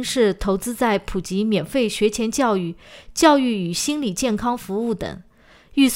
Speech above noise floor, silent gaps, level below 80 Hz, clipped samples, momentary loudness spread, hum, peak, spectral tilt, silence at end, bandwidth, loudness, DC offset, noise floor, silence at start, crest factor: 29 dB; none; -42 dBFS; under 0.1%; 11 LU; none; 0 dBFS; -4.5 dB/octave; 0 s; 16 kHz; -21 LUFS; under 0.1%; -49 dBFS; 0 s; 20 dB